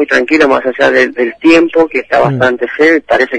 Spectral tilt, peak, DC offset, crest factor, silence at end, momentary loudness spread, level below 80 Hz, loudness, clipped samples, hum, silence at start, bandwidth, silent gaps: -5.5 dB/octave; 0 dBFS; under 0.1%; 10 dB; 0 s; 4 LU; -46 dBFS; -9 LUFS; under 0.1%; none; 0 s; 10 kHz; none